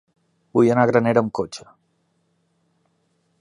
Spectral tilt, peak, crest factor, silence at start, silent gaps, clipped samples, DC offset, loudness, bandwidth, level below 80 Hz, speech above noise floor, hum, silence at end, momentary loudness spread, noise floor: -7 dB/octave; -2 dBFS; 22 dB; 0.55 s; none; under 0.1%; under 0.1%; -19 LUFS; 11 kHz; -62 dBFS; 49 dB; none; 1.8 s; 14 LU; -67 dBFS